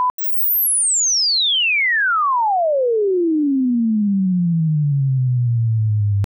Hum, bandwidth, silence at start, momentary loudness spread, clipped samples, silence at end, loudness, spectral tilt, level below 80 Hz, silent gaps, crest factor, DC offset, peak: 50 Hz at -45 dBFS; over 20 kHz; 0 s; 5 LU; under 0.1%; 0.05 s; -16 LUFS; -4 dB/octave; -58 dBFS; 0.10-0.18 s; 4 dB; under 0.1%; -14 dBFS